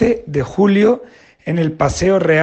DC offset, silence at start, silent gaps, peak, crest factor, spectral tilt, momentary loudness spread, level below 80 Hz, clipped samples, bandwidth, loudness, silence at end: under 0.1%; 0 s; none; -2 dBFS; 14 dB; -6.5 dB/octave; 10 LU; -38 dBFS; under 0.1%; 8.8 kHz; -16 LUFS; 0 s